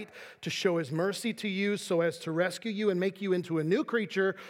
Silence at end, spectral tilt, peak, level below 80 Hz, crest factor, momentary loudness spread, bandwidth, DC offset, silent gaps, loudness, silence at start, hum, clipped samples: 0 s; -5.5 dB/octave; -12 dBFS; -84 dBFS; 18 dB; 4 LU; 16.5 kHz; under 0.1%; none; -30 LUFS; 0 s; none; under 0.1%